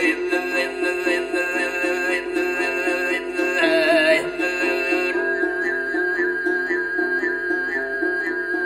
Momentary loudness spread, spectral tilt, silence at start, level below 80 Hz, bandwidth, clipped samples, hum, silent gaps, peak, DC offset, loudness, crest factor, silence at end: 5 LU; -3 dB/octave; 0 s; -56 dBFS; 14 kHz; under 0.1%; none; none; -4 dBFS; under 0.1%; -21 LUFS; 16 dB; 0 s